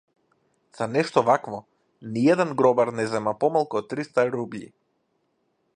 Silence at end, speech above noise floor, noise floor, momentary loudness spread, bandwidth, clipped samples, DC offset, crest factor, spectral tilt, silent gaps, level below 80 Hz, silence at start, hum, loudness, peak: 1.1 s; 49 dB; -72 dBFS; 15 LU; 10.5 kHz; under 0.1%; under 0.1%; 22 dB; -6.5 dB/octave; none; -70 dBFS; 0.75 s; none; -23 LUFS; -4 dBFS